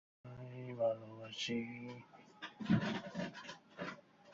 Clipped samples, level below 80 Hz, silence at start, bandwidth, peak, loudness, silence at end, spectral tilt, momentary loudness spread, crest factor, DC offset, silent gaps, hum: under 0.1%; -72 dBFS; 0.25 s; 7.6 kHz; -22 dBFS; -42 LUFS; 0 s; -5 dB/octave; 17 LU; 20 dB; under 0.1%; none; none